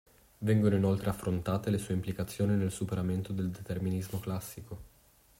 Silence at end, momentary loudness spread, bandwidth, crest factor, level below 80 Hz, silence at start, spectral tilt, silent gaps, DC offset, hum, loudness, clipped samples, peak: 0.5 s; 11 LU; 16 kHz; 18 dB; -58 dBFS; 0.4 s; -7 dB/octave; none; under 0.1%; none; -32 LUFS; under 0.1%; -14 dBFS